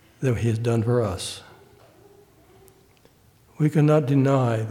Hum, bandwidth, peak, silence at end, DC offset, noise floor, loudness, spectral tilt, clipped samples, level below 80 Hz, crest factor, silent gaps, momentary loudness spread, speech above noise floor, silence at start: none; 14.5 kHz; -6 dBFS; 0 s; under 0.1%; -56 dBFS; -22 LUFS; -7.5 dB/octave; under 0.1%; -54 dBFS; 18 dB; none; 11 LU; 36 dB; 0.2 s